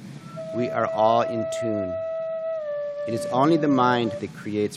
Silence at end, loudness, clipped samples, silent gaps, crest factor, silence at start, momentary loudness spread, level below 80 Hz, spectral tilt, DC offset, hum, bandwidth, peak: 0 s; -24 LUFS; under 0.1%; none; 18 dB; 0 s; 10 LU; -68 dBFS; -6.5 dB/octave; under 0.1%; none; 12.5 kHz; -6 dBFS